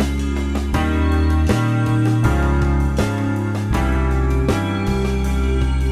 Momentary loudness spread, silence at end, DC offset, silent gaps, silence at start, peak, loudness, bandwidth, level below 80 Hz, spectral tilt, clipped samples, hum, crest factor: 4 LU; 0 s; under 0.1%; none; 0 s; -4 dBFS; -19 LUFS; 13.5 kHz; -20 dBFS; -7 dB/octave; under 0.1%; none; 14 dB